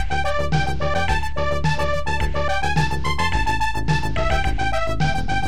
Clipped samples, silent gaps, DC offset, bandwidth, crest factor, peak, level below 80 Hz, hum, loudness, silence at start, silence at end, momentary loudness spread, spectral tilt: under 0.1%; none; 7%; 14 kHz; 14 dB; -6 dBFS; -28 dBFS; none; -22 LUFS; 0 s; 0 s; 2 LU; -5.5 dB/octave